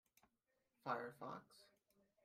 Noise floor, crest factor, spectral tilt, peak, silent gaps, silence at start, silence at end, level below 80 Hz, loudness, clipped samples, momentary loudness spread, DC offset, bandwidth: -87 dBFS; 24 dB; -5.5 dB/octave; -30 dBFS; none; 0.85 s; 0.6 s; under -90 dBFS; -50 LUFS; under 0.1%; 21 LU; under 0.1%; 15.5 kHz